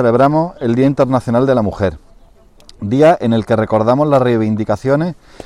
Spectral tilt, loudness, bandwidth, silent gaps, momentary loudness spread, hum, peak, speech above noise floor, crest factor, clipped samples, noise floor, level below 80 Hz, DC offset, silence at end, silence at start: -8 dB/octave; -14 LUFS; 11.5 kHz; none; 8 LU; none; -2 dBFS; 31 dB; 12 dB; under 0.1%; -44 dBFS; -42 dBFS; under 0.1%; 0.3 s; 0 s